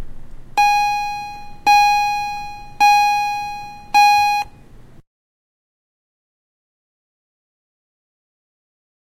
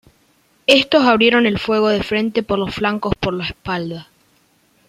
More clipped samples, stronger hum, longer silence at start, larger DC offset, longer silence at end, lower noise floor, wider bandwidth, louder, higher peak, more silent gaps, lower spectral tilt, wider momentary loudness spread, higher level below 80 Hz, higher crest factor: neither; neither; second, 0 s vs 0.7 s; neither; first, 4.1 s vs 0.85 s; second, -41 dBFS vs -58 dBFS; about the same, 15.5 kHz vs 15 kHz; about the same, -16 LUFS vs -16 LUFS; about the same, -2 dBFS vs 0 dBFS; neither; second, 0 dB/octave vs -5 dB/octave; first, 17 LU vs 12 LU; about the same, -42 dBFS vs -44 dBFS; about the same, 18 dB vs 18 dB